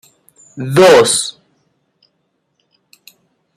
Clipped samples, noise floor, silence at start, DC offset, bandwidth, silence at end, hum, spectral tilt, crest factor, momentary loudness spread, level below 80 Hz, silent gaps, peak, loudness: under 0.1%; -66 dBFS; 0.55 s; under 0.1%; 16 kHz; 2.25 s; none; -3.5 dB/octave; 16 dB; 17 LU; -56 dBFS; none; 0 dBFS; -10 LUFS